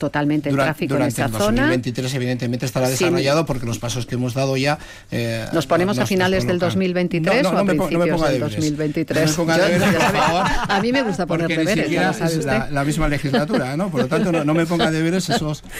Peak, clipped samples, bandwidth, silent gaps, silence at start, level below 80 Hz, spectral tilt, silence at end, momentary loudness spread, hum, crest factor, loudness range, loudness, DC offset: -8 dBFS; under 0.1%; 16 kHz; none; 0 s; -38 dBFS; -5.5 dB/octave; 0 s; 6 LU; none; 12 dB; 3 LU; -19 LUFS; under 0.1%